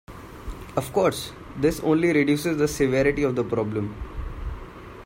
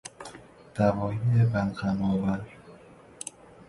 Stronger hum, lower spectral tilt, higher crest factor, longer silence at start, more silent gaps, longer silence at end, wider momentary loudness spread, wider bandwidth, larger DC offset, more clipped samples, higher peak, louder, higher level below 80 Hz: neither; second, -6 dB/octave vs -7.5 dB/octave; about the same, 18 dB vs 20 dB; about the same, 0.1 s vs 0.05 s; neither; second, 0 s vs 0.4 s; about the same, 19 LU vs 19 LU; first, 16 kHz vs 11.5 kHz; neither; neither; about the same, -8 dBFS vs -10 dBFS; first, -23 LUFS vs -27 LUFS; first, -40 dBFS vs -52 dBFS